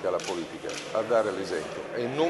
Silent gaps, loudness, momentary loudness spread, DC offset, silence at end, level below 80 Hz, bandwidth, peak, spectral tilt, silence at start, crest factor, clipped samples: none; -30 LUFS; 9 LU; under 0.1%; 0 s; -66 dBFS; 11.5 kHz; -12 dBFS; -4 dB/octave; 0 s; 16 dB; under 0.1%